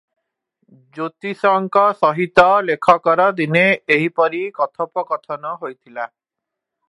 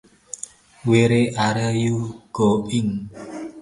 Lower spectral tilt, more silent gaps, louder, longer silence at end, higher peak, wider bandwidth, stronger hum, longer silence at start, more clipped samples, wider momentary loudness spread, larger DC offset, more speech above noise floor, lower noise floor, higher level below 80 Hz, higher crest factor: about the same, -6.5 dB/octave vs -6 dB/octave; neither; first, -16 LUFS vs -21 LUFS; first, 0.85 s vs 0 s; about the same, 0 dBFS vs -2 dBFS; about the same, 11.5 kHz vs 11.5 kHz; neither; first, 0.95 s vs 0.35 s; neither; about the same, 16 LU vs 17 LU; neither; first, 65 dB vs 21 dB; first, -83 dBFS vs -41 dBFS; second, -62 dBFS vs -52 dBFS; about the same, 18 dB vs 18 dB